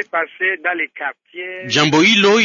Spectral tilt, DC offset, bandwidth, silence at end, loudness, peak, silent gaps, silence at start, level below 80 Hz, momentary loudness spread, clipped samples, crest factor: -3.5 dB/octave; under 0.1%; 7.6 kHz; 0 s; -15 LUFS; -2 dBFS; none; 0 s; -64 dBFS; 17 LU; under 0.1%; 14 dB